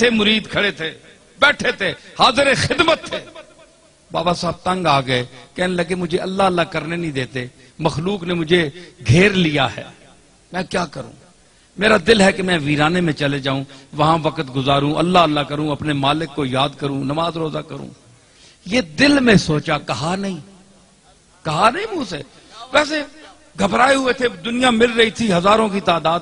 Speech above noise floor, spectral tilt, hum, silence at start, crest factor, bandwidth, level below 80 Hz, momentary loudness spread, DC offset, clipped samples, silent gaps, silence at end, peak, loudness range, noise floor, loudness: 34 dB; -5 dB/octave; none; 0 s; 18 dB; 11 kHz; -44 dBFS; 14 LU; under 0.1%; under 0.1%; none; 0 s; 0 dBFS; 4 LU; -51 dBFS; -17 LUFS